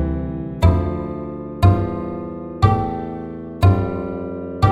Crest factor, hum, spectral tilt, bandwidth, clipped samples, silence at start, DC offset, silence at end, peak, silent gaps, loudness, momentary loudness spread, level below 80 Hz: 18 dB; none; -8.5 dB/octave; 11.5 kHz; under 0.1%; 0 s; under 0.1%; 0 s; 0 dBFS; none; -21 LUFS; 12 LU; -30 dBFS